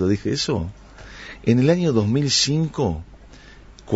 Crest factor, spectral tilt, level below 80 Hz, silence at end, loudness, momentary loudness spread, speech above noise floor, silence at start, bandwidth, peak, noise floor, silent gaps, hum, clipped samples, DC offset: 18 dB; -5 dB/octave; -44 dBFS; 0 s; -20 LUFS; 17 LU; 24 dB; 0 s; 8 kHz; -4 dBFS; -44 dBFS; none; none; under 0.1%; under 0.1%